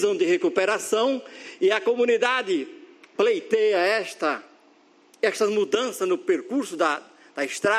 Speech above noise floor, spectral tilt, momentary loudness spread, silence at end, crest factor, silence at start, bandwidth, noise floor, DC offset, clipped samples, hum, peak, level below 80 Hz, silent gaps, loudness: 34 dB; -3 dB/octave; 10 LU; 0 s; 18 dB; 0 s; 14.5 kHz; -57 dBFS; under 0.1%; under 0.1%; none; -6 dBFS; -78 dBFS; none; -24 LUFS